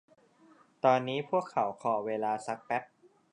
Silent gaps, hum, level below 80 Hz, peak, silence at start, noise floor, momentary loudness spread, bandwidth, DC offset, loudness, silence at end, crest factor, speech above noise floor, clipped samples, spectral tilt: none; none; -82 dBFS; -10 dBFS; 0.85 s; -62 dBFS; 8 LU; 10.5 kHz; under 0.1%; -31 LUFS; 0.5 s; 22 dB; 31 dB; under 0.1%; -5.5 dB/octave